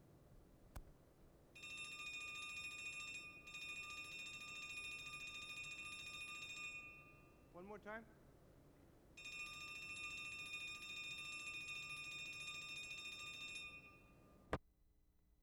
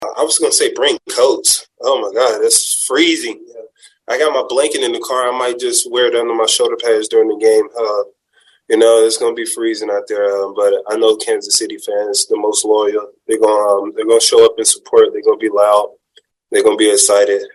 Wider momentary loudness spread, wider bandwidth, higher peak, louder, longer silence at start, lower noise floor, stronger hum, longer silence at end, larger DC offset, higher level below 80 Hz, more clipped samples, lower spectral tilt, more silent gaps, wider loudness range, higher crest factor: first, 20 LU vs 8 LU; first, over 20 kHz vs 12.5 kHz; second, -28 dBFS vs 0 dBFS; second, -50 LUFS vs -13 LUFS; about the same, 0 s vs 0 s; first, -75 dBFS vs -55 dBFS; neither; about the same, 0 s vs 0.05 s; neither; about the same, -70 dBFS vs -66 dBFS; neither; about the same, -1.5 dB/octave vs -0.5 dB/octave; neither; about the same, 5 LU vs 3 LU; first, 26 dB vs 14 dB